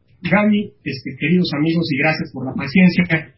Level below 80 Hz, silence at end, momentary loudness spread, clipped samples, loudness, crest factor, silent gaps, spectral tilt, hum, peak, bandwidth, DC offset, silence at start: -50 dBFS; 0.1 s; 12 LU; under 0.1%; -18 LUFS; 16 dB; none; -10.5 dB/octave; none; -2 dBFS; 5.8 kHz; under 0.1%; 0.25 s